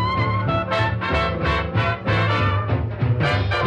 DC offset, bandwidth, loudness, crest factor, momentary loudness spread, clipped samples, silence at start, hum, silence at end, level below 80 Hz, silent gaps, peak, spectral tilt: under 0.1%; 8 kHz; -21 LUFS; 12 dB; 3 LU; under 0.1%; 0 s; none; 0 s; -34 dBFS; none; -10 dBFS; -7 dB/octave